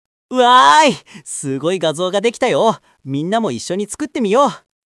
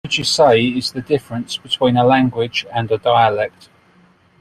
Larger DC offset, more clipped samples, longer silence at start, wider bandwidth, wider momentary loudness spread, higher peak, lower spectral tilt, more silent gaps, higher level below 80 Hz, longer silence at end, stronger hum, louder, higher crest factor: neither; neither; first, 0.3 s vs 0.05 s; second, 12 kHz vs 13.5 kHz; first, 15 LU vs 10 LU; about the same, 0 dBFS vs -2 dBFS; about the same, -3.5 dB/octave vs -4.5 dB/octave; neither; second, -64 dBFS vs -52 dBFS; second, 0.3 s vs 0.9 s; neither; about the same, -15 LUFS vs -16 LUFS; about the same, 16 dB vs 16 dB